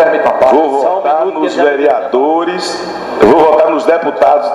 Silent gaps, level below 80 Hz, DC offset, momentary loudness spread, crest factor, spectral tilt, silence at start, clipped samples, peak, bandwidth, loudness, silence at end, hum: none; -50 dBFS; under 0.1%; 8 LU; 10 dB; -5 dB/octave; 0 s; 0.5%; 0 dBFS; 11.5 kHz; -10 LUFS; 0 s; none